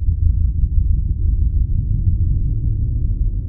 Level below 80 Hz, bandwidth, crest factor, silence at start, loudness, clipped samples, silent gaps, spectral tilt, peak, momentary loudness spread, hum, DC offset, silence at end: -18 dBFS; 0.7 kHz; 12 dB; 0 s; -20 LUFS; under 0.1%; none; -17.5 dB/octave; -4 dBFS; 3 LU; none; under 0.1%; 0 s